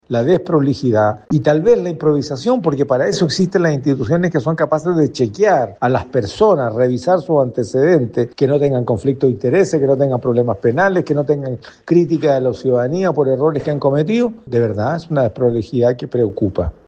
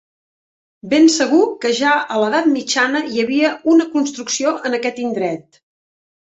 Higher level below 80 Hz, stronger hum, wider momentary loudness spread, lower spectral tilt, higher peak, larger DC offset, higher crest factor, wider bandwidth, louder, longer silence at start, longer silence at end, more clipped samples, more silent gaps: first, -46 dBFS vs -64 dBFS; neither; second, 4 LU vs 8 LU; first, -7 dB/octave vs -3 dB/octave; about the same, 0 dBFS vs -2 dBFS; neither; about the same, 14 dB vs 16 dB; first, 9.2 kHz vs 8.2 kHz; about the same, -16 LUFS vs -16 LUFS; second, 0.1 s vs 0.85 s; second, 0.15 s vs 0.8 s; neither; neither